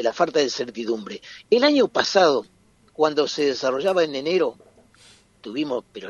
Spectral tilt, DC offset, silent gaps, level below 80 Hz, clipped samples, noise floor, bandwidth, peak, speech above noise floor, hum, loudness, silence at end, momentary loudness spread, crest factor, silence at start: -3.5 dB/octave; under 0.1%; none; -66 dBFS; under 0.1%; -53 dBFS; 11.5 kHz; -2 dBFS; 32 dB; none; -22 LUFS; 0 s; 11 LU; 20 dB; 0 s